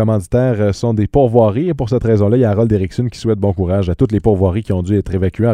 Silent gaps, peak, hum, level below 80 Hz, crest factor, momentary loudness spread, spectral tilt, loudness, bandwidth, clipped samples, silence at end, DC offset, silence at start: none; 0 dBFS; none; -32 dBFS; 14 dB; 5 LU; -9 dB/octave; -15 LUFS; 11 kHz; under 0.1%; 0 s; under 0.1%; 0 s